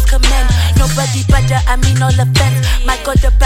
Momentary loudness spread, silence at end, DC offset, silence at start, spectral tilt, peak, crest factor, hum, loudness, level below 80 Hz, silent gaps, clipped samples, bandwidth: 3 LU; 0 s; under 0.1%; 0 s; -4.5 dB/octave; 0 dBFS; 10 dB; none; -12 LUFS; -14 dBFS; none; under 0.1%; 16 kHz